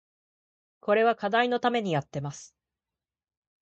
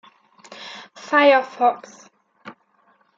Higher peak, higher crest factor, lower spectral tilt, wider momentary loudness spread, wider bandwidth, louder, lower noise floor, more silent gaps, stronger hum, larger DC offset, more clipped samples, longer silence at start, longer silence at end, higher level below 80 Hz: second, -10 dBFS vs -4 dBFS; about the same, 20 dB vs 20 dB; first, -5.5 dB/octave vs -3 dB/octave; second, 14 LU vs 23 LU; first, 8.4 kHz vs 7.6 kHz; second, -26 LUFS vs -17 LUFS; first, under -90 dBFS vs -61 dBFS; neither; neither; neither; neither; first, 0.85 s vs 0.6 s; first, 1.15 s vs 0.65 s; first, -72 dBFS vs -86 dBFS